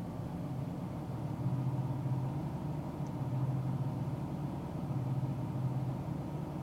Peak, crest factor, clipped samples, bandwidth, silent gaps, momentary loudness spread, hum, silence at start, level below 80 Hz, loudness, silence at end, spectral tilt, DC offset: -24 dBFS; 12 dB; under 0.1%; 13 kHz; none; 5 LU; none; 0 s; -56 dBFS; -38 LUFS; 0 s; -9 dB/octave; under 0.1%